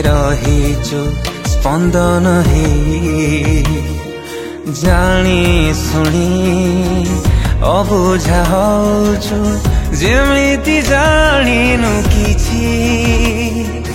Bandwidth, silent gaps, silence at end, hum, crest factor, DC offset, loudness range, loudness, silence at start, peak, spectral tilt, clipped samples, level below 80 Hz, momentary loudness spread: 16.5 kHz; none; 0 s; none; 12 dB; under 0.1%; 2 LU; -13 LUFS; 0 s; 0 dBFS; -5.5 dB/octave; under 0.1%; -18 dBFS; 7 LU